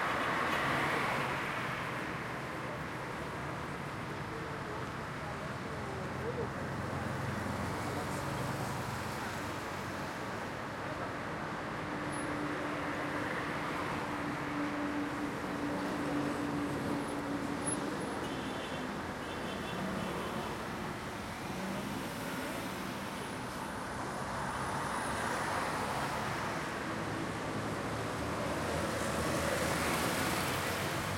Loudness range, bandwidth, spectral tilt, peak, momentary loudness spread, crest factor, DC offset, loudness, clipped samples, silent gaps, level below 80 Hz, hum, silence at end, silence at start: 4 LU; 16.5 kHz; -4.5 dB/octave; -18 dBFS; 7 LU; 18 dB; under 0.1%; -37 LUFS; under 0.1%; none; -58 dBFS; none; 0 s; 0 s